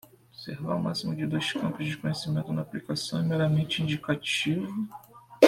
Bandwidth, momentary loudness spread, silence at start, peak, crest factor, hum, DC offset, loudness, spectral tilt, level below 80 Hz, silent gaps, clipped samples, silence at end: 15 kHz; 11 LU; 0.4 s; -4 dBFS; 26 dB; none; under 0.1%; -29 LUFS; -5.5 dB/octave; -62 dBFS; none; under 0.1%; 0 s